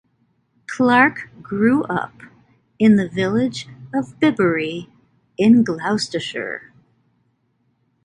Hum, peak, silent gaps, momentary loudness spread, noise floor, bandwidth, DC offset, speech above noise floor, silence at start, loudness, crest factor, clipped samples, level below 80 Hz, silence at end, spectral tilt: none; 0 dBFS; none; 18 LU; -66 dBFS; 10.5 kHz; under 0.1%; 48 dB; 0.7 s; -18 LUFS; 20 dB; under 0.1%; -58 dBFS; 1.45 s; -6 dB/octave